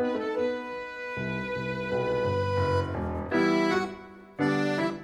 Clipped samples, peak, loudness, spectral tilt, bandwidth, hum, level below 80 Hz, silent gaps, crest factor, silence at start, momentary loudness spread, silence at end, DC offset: under 0.1%; -12 dBFS; -29 LUFS; -6.5 dB/octave; 12.5 kHz; none; -52 dBFS; none; 16 dB; 0 s; 10 LU; 0 s; under 0.1%